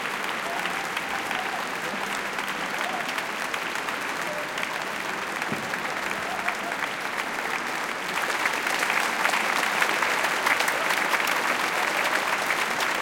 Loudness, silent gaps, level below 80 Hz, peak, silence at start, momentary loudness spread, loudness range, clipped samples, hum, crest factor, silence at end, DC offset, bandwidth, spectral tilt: -26 LUFS; none; -64 dBFS; -6 dBFS; 0 s; 6 LU; 5 LU; under 0.1%; none; 22 dB; 0 s; under 0.1%; 17 kHz; -1.5 dB/octave